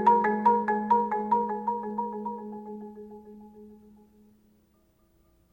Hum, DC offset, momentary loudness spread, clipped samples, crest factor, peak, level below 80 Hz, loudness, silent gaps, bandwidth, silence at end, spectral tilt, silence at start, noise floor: none; under 0.1%; 24 LU; under 0.1%; 20 dB; -10 dBFS; -66 dBFS; -27 LUFS; none; 4.9 kHz; 1.75 s; -8.5 dB/octave; 0 s; -66 dBFS